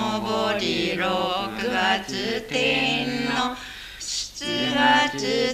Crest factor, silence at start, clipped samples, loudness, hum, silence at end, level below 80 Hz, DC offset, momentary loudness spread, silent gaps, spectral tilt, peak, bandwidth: 20 dB; 0 s; under 0.1%; -23 LUFS; none; 0 s; -52 dBFS; under 0.1%; 9 LU; none; -3 dB/octave; -4 dBFS; 15 kHz